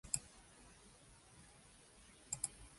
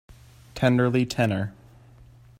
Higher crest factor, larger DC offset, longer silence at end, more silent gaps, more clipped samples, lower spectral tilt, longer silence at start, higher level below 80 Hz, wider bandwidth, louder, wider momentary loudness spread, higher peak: first, 36 dB vs 20 dB; neither; second, 0 s vs 0.9 s; neither; neither; second, -1.5 dB/octave vs -6.5 dB/octave; second, 0.05 s vs 0.55 s; second, -68 dBFS vs -54 dBFS; second, 11.5 kHz vs 15.5 kHz; second, -44 LUFS vs -24 LUFS; first, 19 LU vs 13 LU; second, -16 dBFS vs -6 dBFS